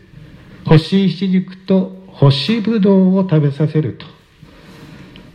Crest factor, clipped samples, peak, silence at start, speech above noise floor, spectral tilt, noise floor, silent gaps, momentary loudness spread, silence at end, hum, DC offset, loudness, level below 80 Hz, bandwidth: 16 dB; under 0.1%; 0 dBFS; 0.5 s; 30 dB; -8.5 dB/octave; -43 dBFS; none; 10 LU; 0.35 s; none; under 0.1%; -15 LUFS; -44 dBFS; 9 kHz